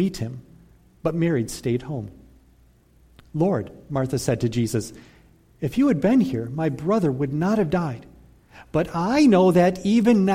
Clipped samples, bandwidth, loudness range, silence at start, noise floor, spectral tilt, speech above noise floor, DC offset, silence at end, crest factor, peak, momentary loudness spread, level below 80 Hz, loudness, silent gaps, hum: under 0.1%; 16 kHz; 6 LU; 0 s; -56 dBFS; -7 dB/octave; 35 dB; under 0.1%; 0 s; 16 dB; -6 dBFS; 15 LU; -50 dBFS; -22 LUFS; none; none